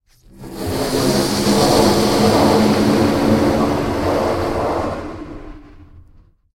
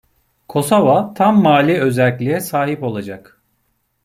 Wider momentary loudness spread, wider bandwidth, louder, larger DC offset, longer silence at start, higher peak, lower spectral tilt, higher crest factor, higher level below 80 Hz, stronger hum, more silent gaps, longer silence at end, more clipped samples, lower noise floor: first, 15 LU vs 12 LU; about the same, 16.5 kHz vs 16 kHz; about the same, -16 LUFS vs -15 LUFS; neither; second, 0.35 s vs 0.5 s; about the same, 0 dBFS vs -2 dBFS; about the same, -5 dB/octave vs -6 dB/octave; about the same, 16 dB vs 14 dB; first, -36 dBFS vs -56 dBFS; neither; neither; second, 0.55 s vs 0.85 s; neither; second, -49 dBFS vs -66 dBFS